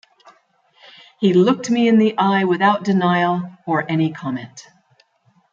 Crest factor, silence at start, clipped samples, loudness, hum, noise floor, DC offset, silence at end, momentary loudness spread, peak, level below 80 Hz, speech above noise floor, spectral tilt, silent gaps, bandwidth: 16 dB; 1.2 s; under 0.1%; -17 LUFS; none; -60 dBFS; under 0.1%; 0.9 s; 11 LU; -2 dBFS; -68 dBFS; 43 dB; -6.5 dB/octave; none; 7.6 kHz